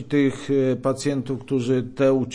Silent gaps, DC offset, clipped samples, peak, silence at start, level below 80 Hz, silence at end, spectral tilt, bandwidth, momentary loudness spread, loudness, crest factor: none; under 0.1%; under 0.1%; -10 dBFS; 0 s; -54 dBFS; 0 s; -6.5 dB/octave; 10.5 kHz; 5 LU; -23 LUFS; 12 dB